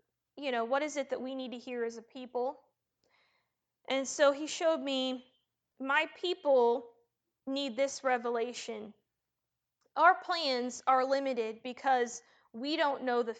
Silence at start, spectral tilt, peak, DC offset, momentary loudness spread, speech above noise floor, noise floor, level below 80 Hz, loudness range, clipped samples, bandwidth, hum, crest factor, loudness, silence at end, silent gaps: 0.35 s; -2 dB/octave; -10 dBFS; under 0.1%; 14 LU; 56 dB; -88 dBFS; -86 dBFS; 6 LU; under 0.1%; 9.2 kHz; none; 22 dB; -32 LUFS; 0 s; none